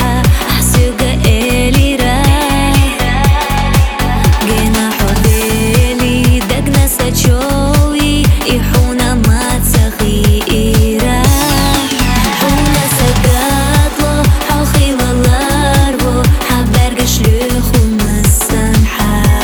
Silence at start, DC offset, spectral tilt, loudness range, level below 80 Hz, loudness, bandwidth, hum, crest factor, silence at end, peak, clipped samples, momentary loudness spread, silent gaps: 0 s; 0.2%; -5 dB/octave; 1 LU; -14 dBFS; -11 LUFS; over 20 kHz; none; 10 dB; 0 s; 0 dBFS; under 0.1%; 2 LU; none